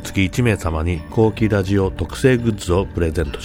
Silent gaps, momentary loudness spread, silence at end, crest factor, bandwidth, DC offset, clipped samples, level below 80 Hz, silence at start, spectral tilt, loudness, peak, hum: none; 5 LU; 0 s; 16 dB; 16.5 kHz; under 0.1%; under 0.1%; -30 dBFS; 0 s; -6.5 dB/octave; -19 LUFS; -2 dBFS; none